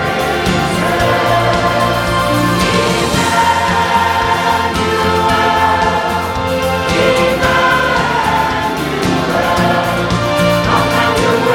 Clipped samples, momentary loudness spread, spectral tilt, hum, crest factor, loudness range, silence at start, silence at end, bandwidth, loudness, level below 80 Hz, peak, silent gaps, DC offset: under 0.1%; 3 LU; -4.5 dB/octave; none; 12 dB; 1 LU; 0 s; 0 s; 18 kHz; -13 LUFS; -32 dBFS; 0 dBFS; none; under 0.1%